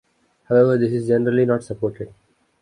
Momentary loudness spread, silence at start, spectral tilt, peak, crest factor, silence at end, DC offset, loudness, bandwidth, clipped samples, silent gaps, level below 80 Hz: 13 LU; 0.5 s; -8.5 dB/octave; -4 dBFS; 16 dB; 0.55 s; under 0.1%; -19 LUFS; 10.5 kHz; under 0.1%; none; -56 dBFS